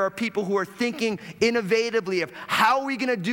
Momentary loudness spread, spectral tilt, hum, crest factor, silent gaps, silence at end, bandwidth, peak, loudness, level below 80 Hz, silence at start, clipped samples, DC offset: 7 LU; -4.5 dB/octave; none; 16 dB; none; 0 s; 18.5 kHz; -8 dBFS; -24 LUFS; -68 dBFS; 0 s; under 0.1%; under 0.1%